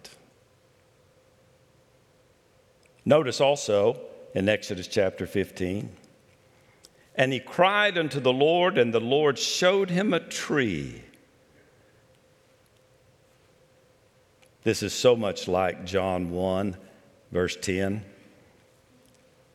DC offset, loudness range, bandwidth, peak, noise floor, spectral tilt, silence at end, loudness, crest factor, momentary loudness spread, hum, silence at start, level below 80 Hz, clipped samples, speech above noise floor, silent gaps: under 0.1%; 9 LU; 15 kHz; -6 dBFS; -61 dBFS; -4.5 dB/octave; 1.45 s; -25 LUFS; 22 dB; 12 LU; none; 0.05 s; -64 dBFS; under 0.1%; 37 dB; none